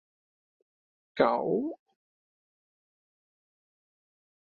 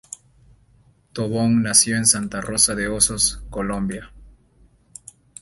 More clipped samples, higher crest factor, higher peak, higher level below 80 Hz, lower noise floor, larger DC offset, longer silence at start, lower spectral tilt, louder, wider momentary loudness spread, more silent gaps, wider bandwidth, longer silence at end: neither; about the same, 26 dB vs 22 dB; second, -10 dBFS vs -2 dBFS; second, -72 dBFS vs -44 dBFS; first, under -90 dBFS vs -56 dBFS; neither; about the same, 1.15 s vs 1.15 s; first, -4.5 dB/octave vs -2.5 dB/octave; second, -29 LUFS vs -19 LUFS; about the same, 19 LU vs 18 LU; neither; second, 6.4 kHz vs 12 kHz; first, 2.75 s vs 1.1 s